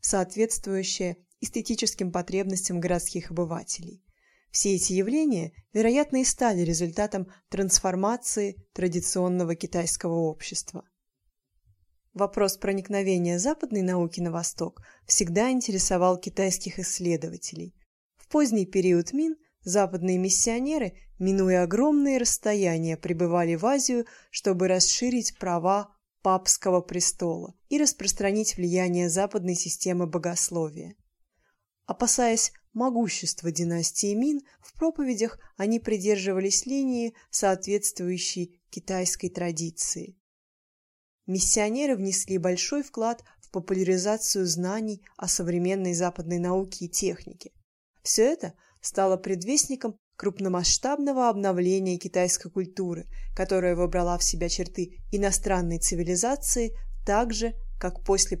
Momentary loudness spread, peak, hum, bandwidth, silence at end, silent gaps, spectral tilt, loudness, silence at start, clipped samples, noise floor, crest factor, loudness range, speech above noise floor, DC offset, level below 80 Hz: 11 LU; -6 dBFS; none; 15 kHz; 0 s; 17.86-18.10 s, 40.20-41.19 s, 47.64-47.94 s, 49.99-50.11 s; -3.5 dB/octave; -26 LUFS; 0.05 s; under 0.1%; -76 dBFS; 22 dB; 4 LU; 49 dB; under 0.1%; -44 dBFS